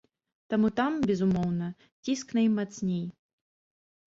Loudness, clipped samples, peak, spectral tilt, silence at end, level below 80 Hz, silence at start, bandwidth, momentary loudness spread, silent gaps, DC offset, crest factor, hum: -29 LUFS; under 0.1%; -16 dBFS; -6.5 dB/octave; 1.05 s; -60 dBFS; 0.5 s; 7.8 kHz; 9 LU; 1.92-2.03 s; under 0.1%; 14 dB; none